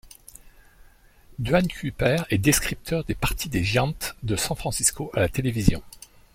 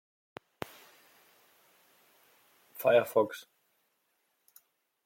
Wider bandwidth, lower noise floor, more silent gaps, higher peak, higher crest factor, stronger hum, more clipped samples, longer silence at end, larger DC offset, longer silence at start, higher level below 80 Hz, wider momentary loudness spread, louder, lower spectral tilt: about the same, 16.5 kHz vs 16.5 kHz; second, -52 dBFS vs -77 dBFS; neither; first, -2 dBFS vs -14 dBFS; about the same, 22 dB vs 22 dB; neither; neither; second, 0.35 s vs 1.65 s; neither; second, 0.05 s vs 2.75 s; first, -38 dBFS vs -80 dBFS; second, 7 LU vs 27 LU; first, -24 LUFS vs -28 LUFS; about the same, -4.5 dB/octave vs -4.5 dB/octave